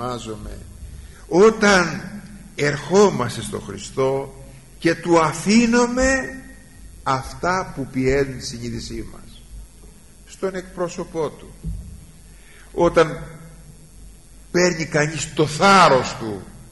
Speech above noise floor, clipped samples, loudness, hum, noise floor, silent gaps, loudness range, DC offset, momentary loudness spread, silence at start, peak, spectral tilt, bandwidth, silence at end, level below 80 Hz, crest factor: 26 dB; under 0.1%; -19 LUFS; none; -45 dBFS; none; 11 LU; 0.3%; 20 LU; 0 s; -4 dBFS; -4.5 dB/octave; 11.5 kHz; 0.05 s; -40 dBFS; 16 dB